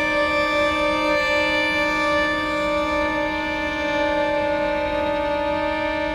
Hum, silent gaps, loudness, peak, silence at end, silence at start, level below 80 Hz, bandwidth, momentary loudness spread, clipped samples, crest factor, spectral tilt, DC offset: none; none; -21 LUFS; -8 dBFS; 0 s; 0 s; -42 dBFS; 14.5 kHz; 4 LU; under 0.1%; 12 dB; -4.5 dB/octave; under 0.1%